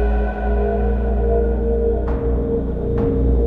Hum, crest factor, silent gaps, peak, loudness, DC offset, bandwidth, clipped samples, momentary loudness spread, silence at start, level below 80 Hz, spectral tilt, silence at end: none; 12 dB; none; -6 dBFS; -20 LUFS; under 0.1%; 3.5 kHz; under 0.1%; 3 LU; 0 s; -20 dBFS; -11.5 dB/octave; 0 s